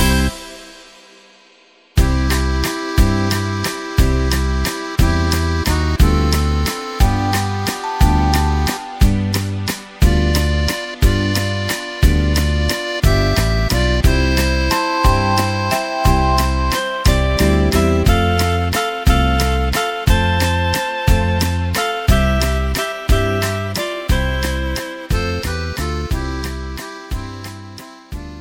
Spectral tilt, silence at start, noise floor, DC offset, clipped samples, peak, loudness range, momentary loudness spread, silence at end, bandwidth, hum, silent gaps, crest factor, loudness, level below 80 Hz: -5 dB/octave; 0 s; -50 dBFS; under 0.1%; under 0.1%; 0 dBFS; 4 LU; 8 LU; 0 s; 17 kHz; none; none; 16 dB; -17 LUFS; -20 dBFS